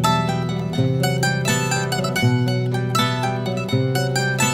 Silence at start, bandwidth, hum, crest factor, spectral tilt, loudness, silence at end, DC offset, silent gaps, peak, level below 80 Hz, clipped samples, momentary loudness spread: 0 s; 16 kHz; none; 16 dB; -5 dB/octave; -20 LUFS; 0 s; under 0.1%; none; -4 dBFS; -48 dBFS; under 0.1%; 4 LU